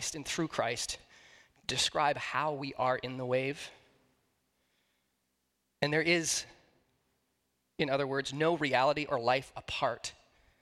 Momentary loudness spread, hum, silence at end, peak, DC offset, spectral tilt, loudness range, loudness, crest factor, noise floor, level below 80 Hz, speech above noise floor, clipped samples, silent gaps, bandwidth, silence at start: 11 LU; none; 0.5 s; -12 dBFS; under 0.1%; -3 dB/octave; 5 LU; -32 LUFS; 22 dB; -80 dBFS; -66 dBFS; 48 dB; under 0.1%; none; 15.5 kHz; 0 s